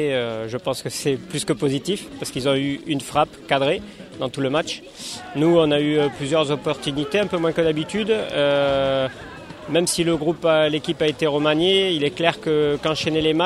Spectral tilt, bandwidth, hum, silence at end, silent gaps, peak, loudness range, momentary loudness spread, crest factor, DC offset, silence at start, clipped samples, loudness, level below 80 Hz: -4.5 dB/octave; 15 kHz; none; 0 s; none; 0 dBFS; 4 LU; 9 LU; 20 dB; under 0.1%; 0 s; under 0.1%; -21 LUFS; -52 dBFS